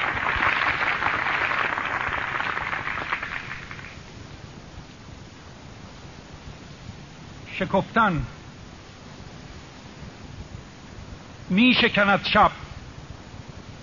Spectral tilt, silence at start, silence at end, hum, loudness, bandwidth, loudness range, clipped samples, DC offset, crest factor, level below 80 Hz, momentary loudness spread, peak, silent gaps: -2.5 dB/octave; 0 s; 0 s; none; -22 LUFS; 7.2 kHz; 19 LU; under 0.1%; 0.1%; 20 dB; -46 dBFS; 24 LU; -6 dBFS; none